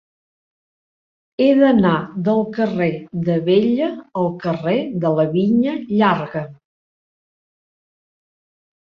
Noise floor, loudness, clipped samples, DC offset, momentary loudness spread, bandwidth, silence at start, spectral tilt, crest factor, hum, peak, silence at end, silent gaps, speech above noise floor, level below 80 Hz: under -90 dBFS; -18 LUFS; under 0.1%; under 0.1%; 9 LU; 6.2 kHz; 1.4 s; -9 dB/octave; 18 dB; none; -2 dBFS; 2.45 s; none; over 73 dB; -58 dBFS